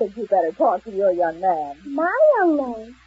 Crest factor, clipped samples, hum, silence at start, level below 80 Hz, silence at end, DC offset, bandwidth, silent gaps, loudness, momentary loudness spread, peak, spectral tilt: 14 dB; under 0.1%; none; 0 s; -58 dBFS; 0.15 s; under 0.1%; 7.6 kHz; none; -20 LUFS; 9 LU; -6 dBFS; -7.5 dB/octave